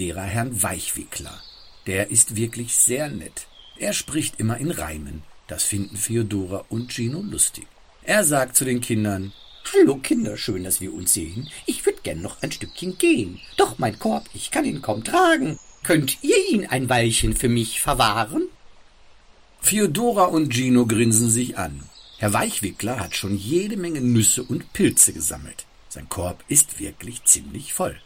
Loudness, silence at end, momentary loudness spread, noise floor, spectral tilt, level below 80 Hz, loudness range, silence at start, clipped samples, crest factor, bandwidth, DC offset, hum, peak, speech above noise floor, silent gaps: -21 LUFS; 0.05 s; 15 LU; -50 dBFS; -3.5 dB/octave; -44 dBFS; 4 LU; 0 s; under 0.1%; 22 dB; 16.5 kHz; under 0.1%; none; 0 dBFS; 28 dB; none